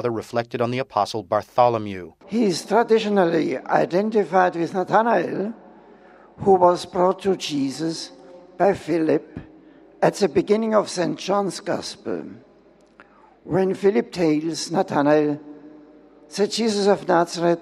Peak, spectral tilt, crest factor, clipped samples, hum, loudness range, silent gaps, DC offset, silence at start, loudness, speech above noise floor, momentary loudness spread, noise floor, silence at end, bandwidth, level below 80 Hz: -2 dBFS; -5.5 dB/octave; 20 dB; under 0.1%; none; 4 LU; none; under 0.1%; 0 s; -21 LUFS; 33 dB; 10 LU; -53 dBFS; 0 s; 13 kHz; -62 dBFS